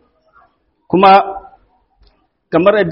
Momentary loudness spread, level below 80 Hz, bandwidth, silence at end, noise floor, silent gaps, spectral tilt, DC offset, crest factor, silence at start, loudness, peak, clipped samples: 16 LU; -52 dBFS; 5.6 kHz; 0 s; -55 dBFS; none; -4 dB/octave; under 0.1%; 14 dB; 0.9 s; -11 LUFS; 0 dBFS; under 0.1%